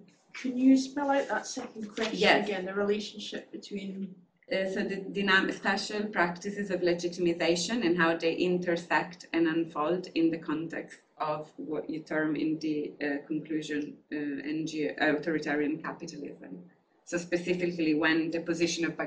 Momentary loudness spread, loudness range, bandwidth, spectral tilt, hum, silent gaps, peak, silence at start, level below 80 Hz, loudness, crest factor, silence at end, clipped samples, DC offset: 14 LU; 5 LU; 9.8 kHz; -4.5 dB/octave; none; none; -8 dBFS; 0.35 s; -70 dBFS; -30 LUFS; 22 dB; 0 s; under 0.1%; under 0.1%